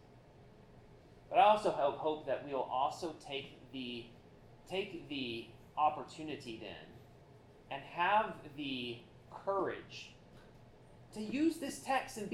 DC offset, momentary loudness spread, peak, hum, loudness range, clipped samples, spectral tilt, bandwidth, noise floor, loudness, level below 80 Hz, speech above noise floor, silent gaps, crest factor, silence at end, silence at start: under 0.1%; 17 LU; -16 dBFS; none; 6 LU; under 0.1%; -4.5 dB/octave; 15 kHz; -60 dBFS; -37 LUFS; -68 dBFS; 23 dB; none; 22 dB; 0 s; 0.05 s